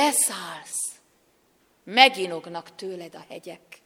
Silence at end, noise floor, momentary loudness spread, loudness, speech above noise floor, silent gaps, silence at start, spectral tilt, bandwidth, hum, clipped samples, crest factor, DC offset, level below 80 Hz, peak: 0.1 s; -64 dBFS; 24 LU; -22 LUFS; 39 dB; none; 0 s; -0.5 dB/octave; over 20 kHz; none; under 0.1%; 26 dB; under 0.1%; -78 dBFS; 0 dBFS